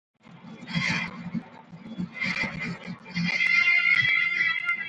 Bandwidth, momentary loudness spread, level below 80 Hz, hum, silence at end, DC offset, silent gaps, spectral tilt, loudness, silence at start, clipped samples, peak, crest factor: 9.2 kHz; 18 LU; -60 dBFS; none; 0 s; under 0.1%; none; -4 dB/octave; -23 LUFS; 0.3 s; under 0.1%; -10 dBFS; 18 dB